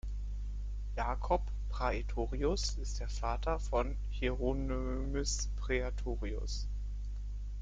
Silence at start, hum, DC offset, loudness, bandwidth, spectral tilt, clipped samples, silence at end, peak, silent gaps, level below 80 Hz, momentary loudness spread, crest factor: 0.05 s; 50 Hz at -35 dBFS; under 0.1%; -37 LUFS; 7.8 kHz; -5 dB/octave; under 0.1%; 0 s; -16 dBFS; none; -36 dBFS; 8 LU; 18 dB